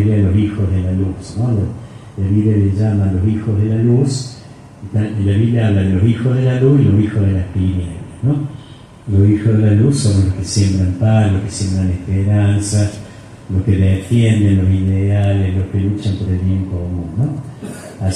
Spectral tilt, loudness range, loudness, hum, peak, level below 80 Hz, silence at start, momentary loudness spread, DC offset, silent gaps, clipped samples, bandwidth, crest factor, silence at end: -7.5 dB/octave; 2 LU; -15 LUFS; none; -2 dBFS; -38 dBFS; 0 s; 11 LU; under 0.1%; none; under 0.1%; 11 kHz; 14 dB; 0 s